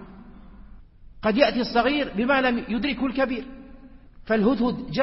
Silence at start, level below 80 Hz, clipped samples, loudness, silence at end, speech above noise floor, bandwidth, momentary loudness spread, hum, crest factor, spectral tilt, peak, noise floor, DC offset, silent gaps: 0 s; -46 dBFS; under 0.1%; -23 LUFS; 0 s; 23 dB; 5.8 kHz; 6 LU; none; 20 dB; -9 dB/octave; -4 dBFS; -46 dBFS; under 0.1%; none